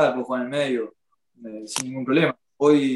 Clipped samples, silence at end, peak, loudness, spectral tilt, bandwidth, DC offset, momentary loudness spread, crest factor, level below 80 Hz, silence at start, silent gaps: under 0.1%; 0 s; -6 dBFS; -23 LUFS; -5 dB/octave; 12.5 kHz; under 0.1%; 18 LU; 18 dB; -70 dBFS; 0 s; none